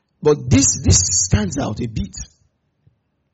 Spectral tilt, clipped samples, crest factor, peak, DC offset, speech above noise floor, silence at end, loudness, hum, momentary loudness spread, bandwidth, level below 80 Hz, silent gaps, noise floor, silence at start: -4 dB/octave; under 0.1%; 18 dB; 0 dBFS; under 0.1%; 47 dB; 1.1 s; -16 LUFS; none; 16 LU; 8.2 kHz; -32 dBFS; none; -64 dBFS; 0.2 s